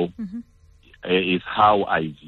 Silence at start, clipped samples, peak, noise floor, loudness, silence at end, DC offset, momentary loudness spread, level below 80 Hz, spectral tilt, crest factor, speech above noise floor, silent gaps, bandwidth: 0 s; under 0.1%; -6 dBFS; -53 dBFS; -20 LUFS; 0 s; under 0.1%; 18 LU; -52 dBFS; -7.5 dB/octave; 18 dB; 32 dB; none; 4.6 kHz